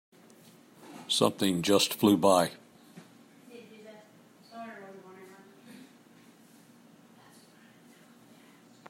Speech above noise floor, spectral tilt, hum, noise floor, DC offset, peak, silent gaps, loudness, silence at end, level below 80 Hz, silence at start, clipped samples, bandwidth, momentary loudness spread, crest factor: 32 dB; -4 dB/octave; none; -57 dBFS; under 0.1%; -10 dBFS; none; -26 LUFS; 3.65 s; -76 dBFS; 0.9 s; under 0.1%; 16 kHz; 28 LU; 24 dB